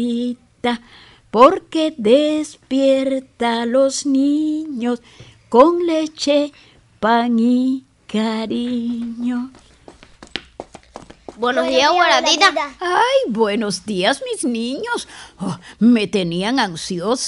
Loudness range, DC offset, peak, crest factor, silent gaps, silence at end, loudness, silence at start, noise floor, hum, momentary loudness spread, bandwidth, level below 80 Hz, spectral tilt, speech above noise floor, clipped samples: 6 LU; under 0.1%; 0 dBFS; 18 dB; none; 0 s; -18 LUFS; 0 s; -45 dBFS; none; 14 LU; 11.5 kHz; -56 dBFS; -4 dB/octave; 28 dB; under 0.1%